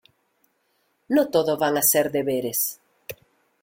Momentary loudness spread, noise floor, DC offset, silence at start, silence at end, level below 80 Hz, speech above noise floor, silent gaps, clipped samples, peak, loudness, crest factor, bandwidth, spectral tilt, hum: 21 LU; -69 dBFS; under 0.1%; 1.1 s; 0.5 s; -66 dBFS; 48 dB; none; under 0.1%; -6 dBFS; -22 LUFS; 18 dB; 17 kHz; -3.5 dB/octave; none